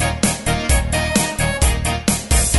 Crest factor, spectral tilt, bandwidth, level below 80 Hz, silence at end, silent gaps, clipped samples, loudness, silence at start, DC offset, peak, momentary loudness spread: 16 dB; -3.5 dB/octave; 12 kHz; -22 dBFS; 0 s; none; under 0.1%; -18 LUFS; 0 s; 0.2%; -2 dBFS; 2 LU